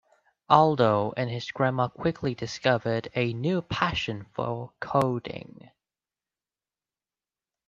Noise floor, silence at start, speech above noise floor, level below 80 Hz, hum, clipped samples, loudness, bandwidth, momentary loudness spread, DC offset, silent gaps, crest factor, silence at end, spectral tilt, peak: under -90 dBFS; 0.5 s; over 64 dB; -58 dBFS; none; under 0.1%; -26 LUFS; 10.5 kHz; 12 LU; under 0.1%; none; 24 dB; 2.25 s; -6.5 dB/octave; -4 dBFS